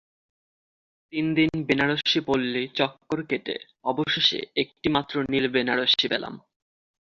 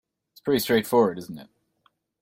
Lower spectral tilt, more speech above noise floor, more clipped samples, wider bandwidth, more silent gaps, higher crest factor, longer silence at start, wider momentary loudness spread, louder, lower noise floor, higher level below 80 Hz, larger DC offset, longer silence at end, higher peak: about the same, -5 dB/octave vs -5 dB/octave; first, over 65 dB vs 45 dB; neither; second, 7.4 kHz vs 16.5 kHz; neither; about the same, 20 dB vs 18 dB; first, 1.1 s vs 0.45 s; second, 9 LU vs 19 LU; about the same, -24 LUFS vs -23 LUFS; first, under -90 dBFS vs -68 dBFS; about the same, -60 dBFS vs -62 dBFS; neither; about the same, 0.65 s vs 0.75 s; about the same, -6 dBFS vs -8 dBFS